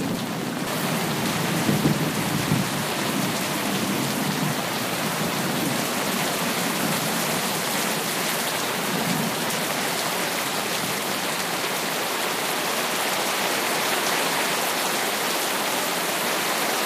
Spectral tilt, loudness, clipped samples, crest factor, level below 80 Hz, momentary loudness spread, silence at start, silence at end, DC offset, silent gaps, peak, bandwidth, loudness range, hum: -3 dB/octave; -23 LUFS; under 0.1%; 16 dB; -60 dBFS; 2 LU; 0 s; 0 s; under 0.1%; none; -8 dBFS; 15.5 kHz; 2 LU; none